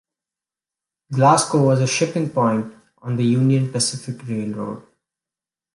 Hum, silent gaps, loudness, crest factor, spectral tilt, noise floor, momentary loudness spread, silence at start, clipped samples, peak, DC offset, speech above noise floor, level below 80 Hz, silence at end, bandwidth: none; none; -19 LUFS; 18 dB; -5.5 dB/octave; -90 dBFS; 15 LU; 1.1 s; under 0.1%; -2 dBFS; under 0.1%; 71 dB; -62 dBFS; 0.95 s; 11.5 kHz